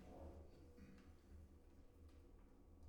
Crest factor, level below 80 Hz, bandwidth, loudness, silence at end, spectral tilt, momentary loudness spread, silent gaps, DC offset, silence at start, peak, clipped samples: 14 dB; -66 dBFS; 17.5 kHz; -65 LUFS; 0 s; -7.5 dB/octave; 9 LU; none; under 0.1%; 0 s; -48 dBFS; under 0.1%